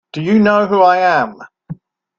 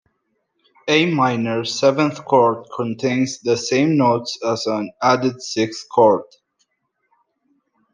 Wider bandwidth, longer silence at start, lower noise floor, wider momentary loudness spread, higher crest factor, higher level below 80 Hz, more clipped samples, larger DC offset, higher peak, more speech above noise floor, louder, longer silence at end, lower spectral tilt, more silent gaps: second, 7 kHz vs 10 kHz; second, 0.15 s vs 0.85 s; second, -33 dBFS vs -71 dBFS; first, 23 LU vs 7 LU; about the same, 14 dB vs 18 dB; first, -56 dBFS vs -68 dBFS; neither; neither; about the same, 0 dBFS vs -2 dBFS; second, 21 dB vs 53 dB; first, -13 LUFS vs -18 LUFS; second, 0.45 s vs 1.7 s; first, -7 dB/octave vs -5 dB/octave; neither